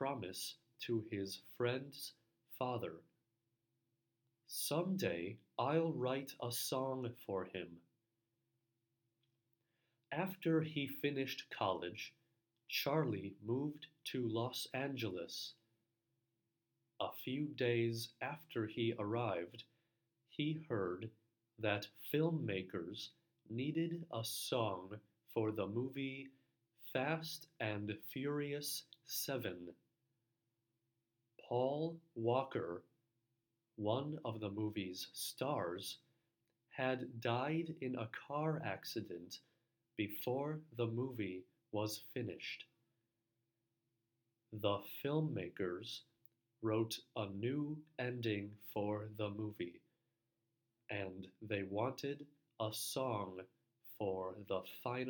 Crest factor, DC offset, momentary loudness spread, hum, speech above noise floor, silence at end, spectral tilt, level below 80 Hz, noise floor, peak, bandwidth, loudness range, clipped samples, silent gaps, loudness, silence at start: 22 dB; under 0.1%; 11 LU; none; 46 dB; 0 s; -5 dB/octave; -84 dBFS; -88 dBFS; -22 dBFS; 19.5 kHz; 4 LU; under 0.1%; none; -42 LUFS; 0 s